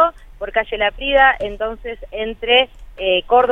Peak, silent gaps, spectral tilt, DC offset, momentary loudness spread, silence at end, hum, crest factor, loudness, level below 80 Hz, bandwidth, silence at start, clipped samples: 0 dBFS; none; -5 dB/octave; under 0.1%; 13 LU; 0 s; none; 18 dB; -17 LUFS; -38 dBFS; 4.1 kHz; 0 s; under 0.1%